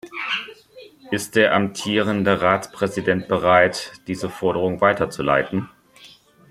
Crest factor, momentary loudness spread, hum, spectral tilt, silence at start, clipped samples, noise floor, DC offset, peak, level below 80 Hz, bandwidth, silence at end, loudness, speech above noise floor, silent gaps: 20 dB; 12 LU; none; -5 dB/octave; 0.05 s; under 0.1%; -49 dBFS; under 0.1%; 0 dBFS; -56 dBFS; 15.5 kHz; 0.45 s; -20 LUFS; 29 dB; none